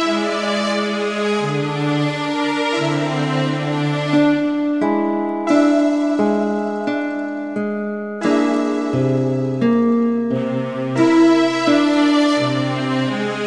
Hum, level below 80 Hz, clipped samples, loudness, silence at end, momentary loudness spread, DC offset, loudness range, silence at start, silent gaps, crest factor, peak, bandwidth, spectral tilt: none; -62 dBFS; under 0.1%; -18 LUFS; 0 s; 7 LU; 0.2%; 3 LU; 0 s; none; 14 dB; -4 dBFS; 10.5 kHz; -6 dB/octave